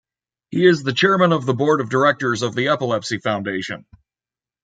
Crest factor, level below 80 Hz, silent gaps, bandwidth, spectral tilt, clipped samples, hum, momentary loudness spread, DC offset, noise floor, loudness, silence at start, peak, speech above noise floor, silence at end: 18 dB; -62 dBFS; none; 9.2 kHz; -5.5 dB/octave; under 0.1%; none; 10 LU; under 0.1%; under -90 dBFS; -18 LUFS; 0.5 s; -2 dBFS; over 72 dB; 0.85 s